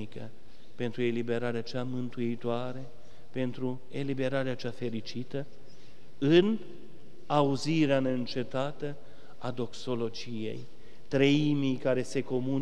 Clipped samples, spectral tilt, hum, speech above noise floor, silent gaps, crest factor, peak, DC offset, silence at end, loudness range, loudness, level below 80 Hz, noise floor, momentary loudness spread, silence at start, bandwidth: under 0.1%; -6.5 dB/octave; none; 26 dB; none; 22 dB; -10 dBFS; 2%; 0 s; 6 LU; -31 LUFS; -66 dBFS; -56 dBFS; 16 LU; 0 s; 11 kHz